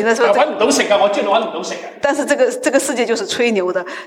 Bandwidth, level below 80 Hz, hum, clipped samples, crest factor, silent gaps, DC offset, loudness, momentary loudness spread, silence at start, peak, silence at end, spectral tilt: 17 kHz; -64 dBFS; none; under 0.1%; 14 dB; none; under 0.1%; -16 LUFS; 7 LU; 0 s; -2 dBFS; 0 s; -2.5 dB/octave